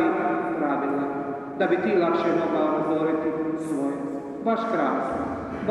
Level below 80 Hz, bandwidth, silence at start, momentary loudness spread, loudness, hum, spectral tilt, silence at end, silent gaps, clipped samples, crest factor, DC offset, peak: -58 dBFS; 11.5 kHz; 0 s; 8 LU; -25 LUFS; none; -7 dB/octave; 0 s; none; under 0.1%; 14 dB; under 0.1%; -10 dBFS